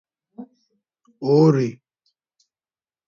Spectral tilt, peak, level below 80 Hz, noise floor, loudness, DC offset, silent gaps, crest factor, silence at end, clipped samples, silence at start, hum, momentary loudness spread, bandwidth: -8.5 dB/octave; -4 dBFS; -68 dBFS; under -90 dBFS; -19 LUFS; under 0.1%; none; 20 dB; 1.35 s; under 0.1%; 0.4 s; none; 27 LU; 7.2 kHz